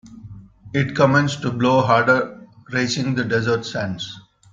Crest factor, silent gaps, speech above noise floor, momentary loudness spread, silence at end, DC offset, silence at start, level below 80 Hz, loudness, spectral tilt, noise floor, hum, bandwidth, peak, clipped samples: 18 dB; none; 21 dB; 13 LU; 0.35 s; under 0.1%; 0.05 s; -54 dBFS; -19 LUFS; -5.5 dB/octave; -40 dBFS; none; 7.6 kHz; -2 dBFS; under 0.1%